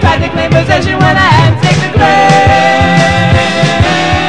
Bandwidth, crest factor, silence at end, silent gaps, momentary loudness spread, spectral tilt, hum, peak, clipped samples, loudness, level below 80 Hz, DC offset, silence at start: 11 kHz; 8 dB; 0 s; none; 4 LU; -5.5 dB/octave; none; 0 dBFS; 3%; -8 LUFS; -26 dBFS; 3%; 0 s